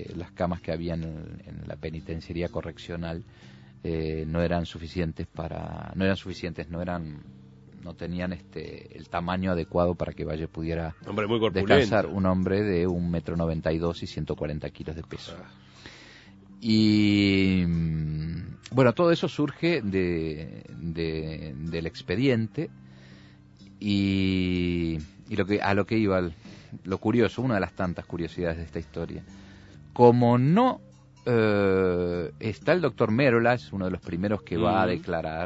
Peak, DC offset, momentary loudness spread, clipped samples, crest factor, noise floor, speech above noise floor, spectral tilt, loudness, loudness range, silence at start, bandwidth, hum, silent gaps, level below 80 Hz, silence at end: -4 dBFS; under 0.1%; 17 LU; under 0.1%; 24 dB; -51 dBFS; 24 dB; -7.5 dB/octave; -27 LUFS; 9 LU; 0 s; 8 kHz; none; none; -48 dBFS; 0 s